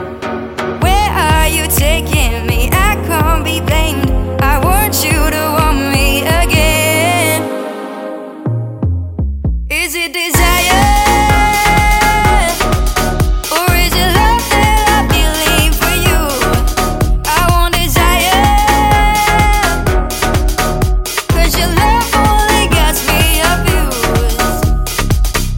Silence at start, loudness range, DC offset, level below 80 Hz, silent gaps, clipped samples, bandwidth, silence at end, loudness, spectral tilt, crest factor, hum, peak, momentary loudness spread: 0 s; 3 LU; under 0.1%; -16 dBFS; none; under 0.1%; 17 kHz; 0 s; -12 LUFS; -4 dB/octave; 12 dB; none; 0 dBFS; 7 LU